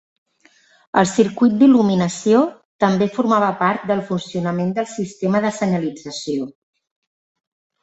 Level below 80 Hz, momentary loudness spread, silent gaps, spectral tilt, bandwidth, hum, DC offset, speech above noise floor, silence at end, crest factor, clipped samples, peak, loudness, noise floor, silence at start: -60 dBFS; 11 LU; 2.65-2.79 s; -6 dB/octave; 8.2 kHz; none; under 0.1%; 38 dB; 1.3 s; 18 dB; under 0.1%; -2 dBFS; -18 LUFS; -55 dBFS; 0.95 s